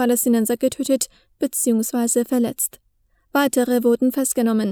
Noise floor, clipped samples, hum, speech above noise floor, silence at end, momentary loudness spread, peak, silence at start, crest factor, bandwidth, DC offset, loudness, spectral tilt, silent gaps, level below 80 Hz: -63 dBFS; under 0.1%; none; 43 dB; 0 s; 7 LU; -4 dBFS; 0 s; 16 dB; over 20 kHz; under 0.1%; -20 LUFS; -3.5 dB/octave; none; -62 dBFS